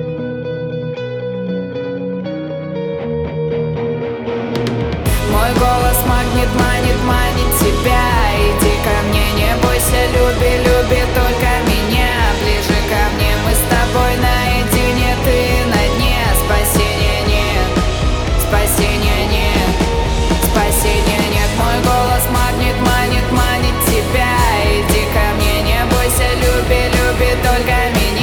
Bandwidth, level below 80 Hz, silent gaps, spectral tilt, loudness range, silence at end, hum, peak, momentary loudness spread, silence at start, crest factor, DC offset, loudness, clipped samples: over 20 kHz; -18 dBFS; none; -4.5 dB/octave; 5 LU; 0 s; none; -2 dBFS; 8 LU; 0 s; 12 dB; under 0.1%; -15 LUFS; under 0.1%